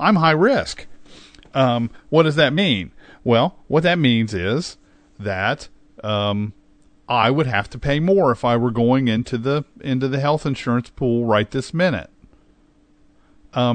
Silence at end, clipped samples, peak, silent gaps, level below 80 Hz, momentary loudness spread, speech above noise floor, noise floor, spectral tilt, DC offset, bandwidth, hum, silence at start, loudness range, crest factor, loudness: 0 s; under 0.1%; -2 dBFS; none; -46 dBFS; 11 LU; 37 dB; -55 dBFS; -6.5 dB/octave; under 0.1%; 9.4 kHz; none; 0 s; 4 LU; 18 dB; -19 LUFS